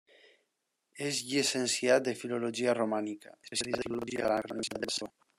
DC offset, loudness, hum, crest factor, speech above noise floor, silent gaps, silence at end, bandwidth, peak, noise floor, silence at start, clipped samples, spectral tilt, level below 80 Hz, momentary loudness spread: under 0.1%; -32 LUFS; none; 20 dB; 50 dB; none; 0.3 s; 15 kHz; -12 dBFS; -82 dBFS; 0.95 s; under 0.1%; -3 dB/octave; -72 dBFS; 9 LU